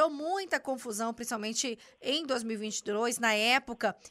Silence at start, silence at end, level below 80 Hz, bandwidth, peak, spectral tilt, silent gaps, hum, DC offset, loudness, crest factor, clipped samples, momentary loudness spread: 0 s; 0 s; -72 dBFS; 15.5 kHz; -14 dBFS; -2 dB/octave; none; none; under 0.1%; -31 LUFS; 18 dB; under 0.1%; 9 LU